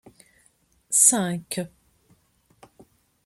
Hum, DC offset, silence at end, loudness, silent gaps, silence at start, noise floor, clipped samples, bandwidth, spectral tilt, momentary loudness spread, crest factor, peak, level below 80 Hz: none; under 0.1%; 1.6 s; -20 LUFS; none; 0.9 s; -64 dBFS; under 0.1%; 15.5 kHz; -2.5 dB/octave; 16 LU; 26 dB; -2 dBFS; -68 dBFS